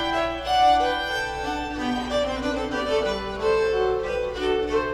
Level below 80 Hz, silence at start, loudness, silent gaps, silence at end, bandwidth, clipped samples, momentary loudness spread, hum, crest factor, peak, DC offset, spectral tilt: -42 dBFS; 0 s; -24 LUFS; none; 0 s; 14 kHz; under 0.1%; 8 LU; none; 14 dB; -10 dBFS; under 0.1%; -4 dB/octave